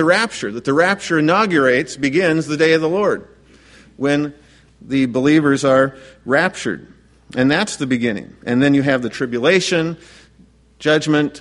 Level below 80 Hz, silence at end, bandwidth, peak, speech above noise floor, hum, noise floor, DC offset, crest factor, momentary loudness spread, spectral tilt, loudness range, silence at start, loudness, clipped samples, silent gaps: -54 dBFS; 0 s; 11.5 kHz; 0 dBFS; 34 dB; none; -50 dBFS; under 0.1%; 16 dB; 10 LU; -5 dB/octave; 2 LU; 0 s; -17 LUFS; under 0.1%; none